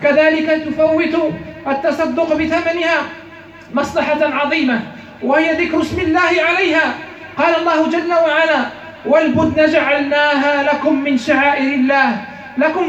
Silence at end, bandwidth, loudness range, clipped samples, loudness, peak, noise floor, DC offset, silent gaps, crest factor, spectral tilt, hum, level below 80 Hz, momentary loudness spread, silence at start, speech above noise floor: 0 s; 8.6 kHz; 3 LU; under 0.1%; -15 LUFS; -2 dBFS; -37 dBFS; under 0.1%; none; 14 dB; -5 dB/octave; none; -48 dBFS; 9 LU; 0 s; 22 dB